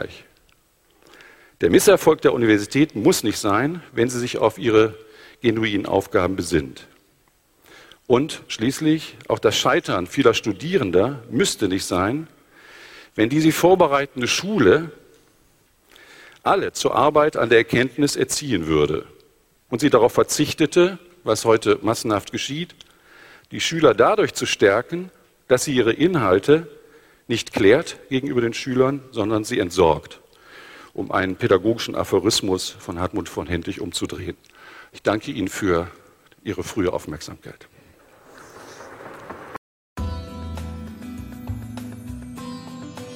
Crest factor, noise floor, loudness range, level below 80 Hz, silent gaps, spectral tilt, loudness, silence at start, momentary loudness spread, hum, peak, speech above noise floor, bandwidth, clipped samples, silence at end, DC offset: 20 dB; -60 dBFS; 12 LU; -48 dBFS; 39.58-39.96 s; -4.5 dB/octave; -20 LUFS; 0 s; 19 LU; none; 0 dBFS; 41 dB; 16.5 kHz; under 0.1%; 0 s; under 0.1%